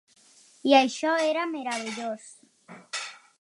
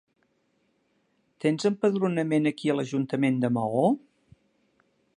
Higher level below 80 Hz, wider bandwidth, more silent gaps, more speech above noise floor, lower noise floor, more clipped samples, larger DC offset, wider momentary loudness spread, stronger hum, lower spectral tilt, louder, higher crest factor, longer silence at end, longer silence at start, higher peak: second, -86 dBFS vs -74 dBFS; about the same, 11.5 kHz vs 10.5 kHz; neither; second, 33 dB vs 46 dB; second, -58 dBFS vs -71 dBFS; neither; neither; first, 15 LU vs 4 LU; neither; second, -2.5 dB/octave vs -7 dB/octave; about the same, -26 LUFS vs -26 LUFS; about the same, 22 dB vs 18 dB; second, 0.25 s vs 1.2 s; second, 0.65 s vs 1.45 s; first, -6 dBFS vs -10 dBFS